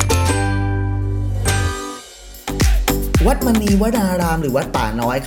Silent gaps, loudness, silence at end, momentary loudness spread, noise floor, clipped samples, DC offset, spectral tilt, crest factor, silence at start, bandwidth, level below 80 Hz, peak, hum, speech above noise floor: none; -18 LUFS; 0 s; 11 LU; -37 dBFS; under 0.1%; under 0.1%; -5.5 dB/octave; 16 dB; 0 s; 19.5 kHz; -24 dBFS; -2 dBFS; none; 20 dB